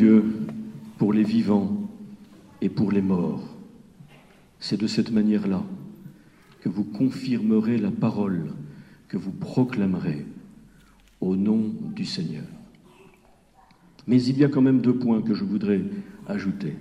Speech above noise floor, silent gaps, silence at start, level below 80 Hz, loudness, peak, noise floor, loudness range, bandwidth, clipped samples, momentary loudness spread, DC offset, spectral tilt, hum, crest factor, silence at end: 33 dB; none; 0 s; -62 dBFS; -24 LUFS; -6 dBFS; -56 dBFS; 6 LU; 9 kHz; under 0.1%; 17 LU; under 0.1%; -8 dB/octave; none; 18 dB; 0 s